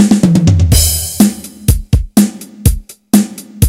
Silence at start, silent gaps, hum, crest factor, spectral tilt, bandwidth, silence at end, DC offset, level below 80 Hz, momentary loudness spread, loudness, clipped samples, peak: 0 s; none; none; 10 dB; -5.5 dB/octave; over 20 kHz; 0 s; under 0.1%; -20 dBFS; 7 LU; -12 LUFS; 1%; 0 dBFS